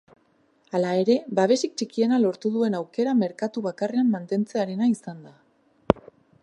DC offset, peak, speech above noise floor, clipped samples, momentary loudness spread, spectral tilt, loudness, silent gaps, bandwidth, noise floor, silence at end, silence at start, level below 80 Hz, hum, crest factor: under 0.1%; 0 dBFS; 40 dB; under 0.1%; 7 LU; -6 dB/octave; -24 LUFS; none; 11 kHz; -64 dBFS; 0.45 s; 0.75 s; -56 dBFS; none; 24 dB